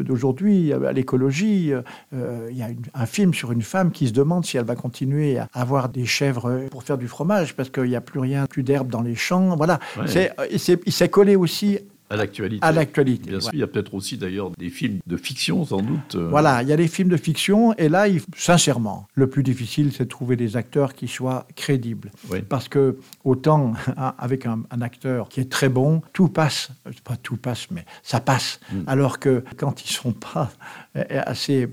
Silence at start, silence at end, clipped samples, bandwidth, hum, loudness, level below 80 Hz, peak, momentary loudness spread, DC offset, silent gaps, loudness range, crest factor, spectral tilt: 0 s; 0 s; under 0.1%; 16.5 kHz; none; -22 LUFS; -56 dBFS; -2 dBFS; 11 LU; under 0.1%; none; 5 LU; 18 dB; -6 dB/octave